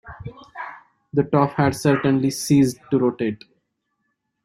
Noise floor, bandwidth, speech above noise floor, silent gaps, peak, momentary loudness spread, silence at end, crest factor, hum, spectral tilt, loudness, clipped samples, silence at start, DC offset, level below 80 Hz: -74 dBFS; 16 kHz; 55 dB; none; -2 dBFS; 19 LU; 1.1 s; 20 dB; none; -6.5 dB/octave; -20 LUFS; under 0.1%; 0.05 s; under 0.1%; -54 dBFS